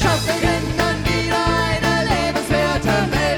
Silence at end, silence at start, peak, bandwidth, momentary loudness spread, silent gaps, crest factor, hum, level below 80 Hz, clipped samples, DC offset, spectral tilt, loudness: 0 s; 0 s; -2 dBFS; 19 kHz; 2 LU; none; 16 dB; none; -30 dBFS; under 0.1%; under 0.1%; -4.5 dB/octave; -18 LUFS